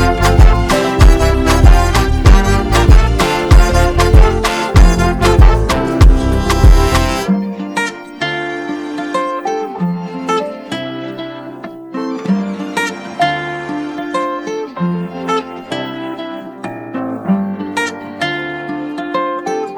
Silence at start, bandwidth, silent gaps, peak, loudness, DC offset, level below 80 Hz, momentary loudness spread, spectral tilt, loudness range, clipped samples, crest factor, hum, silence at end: 0 s; 14.5 kHz; none; 0 dBFS; -14 LUFS; under 0.1%; -14 dBFS; 13 LU; -6 dB/octave; 10 LU; 0.1%; 12 dB; none; 0 s